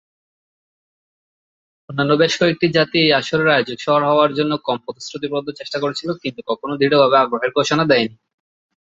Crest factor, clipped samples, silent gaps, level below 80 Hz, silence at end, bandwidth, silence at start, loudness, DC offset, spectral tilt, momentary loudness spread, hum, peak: 18 dB; under 0.1%; none; -60 dBFS; 0.7 s; 8 kHz; 1.9 s; -17 LUFS; under 0.1%; -5 dB/octave; 11 LU; none; 0 dBFS